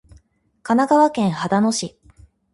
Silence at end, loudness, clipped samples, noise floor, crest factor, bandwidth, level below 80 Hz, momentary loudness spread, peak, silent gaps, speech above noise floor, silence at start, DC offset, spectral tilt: 0.65 s; -18 LUFS; under 0.1%; -55 dBFS; 16 dB; 11.5 kHz; -54 dBFS; 14 LU; -4 dBFS; none; 38 dB; 0.65 s; under 0.1%; -5 dB/octave